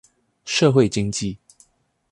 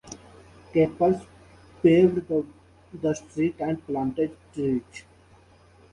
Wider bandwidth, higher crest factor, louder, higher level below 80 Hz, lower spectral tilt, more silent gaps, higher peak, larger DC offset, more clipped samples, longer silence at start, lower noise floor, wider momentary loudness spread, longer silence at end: about the same, 11.5 kHz vs 11 kHz; about the same, 18 dB vs 20 dB; first, -20 LUFS vs -25 LUFS; first, -50 dBFS vs -56 dBFS; second, -5 dB/octave vs -7.5 dB/octave; neither; about the same, -4 dBFS vs -6 dBFS; neither; neither; first, 0.45 s vs 0.05 s; first, -63 dBFS vs -55 dBFS; about the same, 21 LU vs 23 LU; second, 0.75 s vs 0.9 s